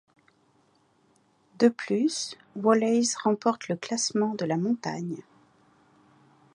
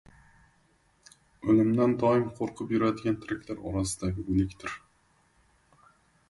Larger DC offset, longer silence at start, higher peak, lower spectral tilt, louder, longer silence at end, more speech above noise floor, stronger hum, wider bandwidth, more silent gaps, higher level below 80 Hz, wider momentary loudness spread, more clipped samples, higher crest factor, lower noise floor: neither; first, 1.6 s vs 1.45 s; about the same, -8 dBFS vs -10 dBFS; second, -4.5 dB/octave vs -6.5 dB/octave; about the same, -27 LUFS vs -28 LUFS; second, 1.35 s vs 1.55 s; about the same, 39 dB vs 39 dB; neither; about the same, 11.5 kHz vs 11.5 kHz; neither; second, -78 dBFS vs -50 dBFS; about the same, 10 LU vs 12 LU; neither; about the same, 22 dB vs 20 dB; about the same, -65 dBFS vs -67 dBFS